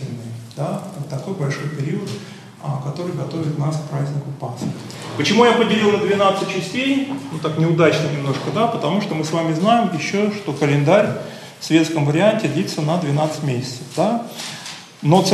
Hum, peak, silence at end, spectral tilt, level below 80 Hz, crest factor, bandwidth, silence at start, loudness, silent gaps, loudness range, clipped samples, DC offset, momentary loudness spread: none; 0 dBFS; 0 s; -6 dB/octave; -64 dBFS; 18 dB; 13 kHz; 0 s; -19 LUFS; none; 7 LU; under 0.1%; under 0.1%; 13 LU